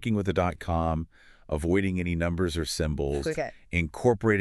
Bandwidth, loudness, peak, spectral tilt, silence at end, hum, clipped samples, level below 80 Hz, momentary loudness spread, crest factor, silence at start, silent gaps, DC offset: 13 kHz; -28 LUFS; -10 dBFS; -6 dB/octave; 0 s; none; under 0.1%; -40 dBFS; 6 LU; 18 dB; 0 s; none; under 0.1%